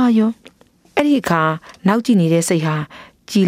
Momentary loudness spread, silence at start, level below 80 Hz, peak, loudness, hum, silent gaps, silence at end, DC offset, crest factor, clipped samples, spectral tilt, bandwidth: 9 LU; 0 s; -58 dBFS; 0 dBFS; -17 LUFS; none; none; 0 s; under 0.1%; 16 dB; under 0.1%; -6 dB/octave; 15.5 kHz